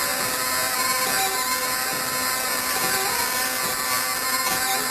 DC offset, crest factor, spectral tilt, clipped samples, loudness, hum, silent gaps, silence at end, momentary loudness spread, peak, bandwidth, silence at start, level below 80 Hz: under 0.1%; 18 dB; 0 dB/octave; under 0.1%; -21 LUFS; none; none; 0 s; 2 LU; -6 dBFS; 14 kHz; 0 s; -54 dBFS